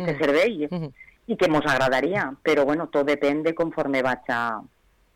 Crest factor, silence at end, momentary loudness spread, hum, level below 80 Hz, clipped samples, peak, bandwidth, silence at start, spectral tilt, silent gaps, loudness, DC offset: 10 dB; 0.55 s; 9 LU; none; -54 dBFS; under 0.1%; -14 dBFS; 17.5 kHz; 0 s; -5.5 dB/octave; none; -23 LUFS; under 0.1%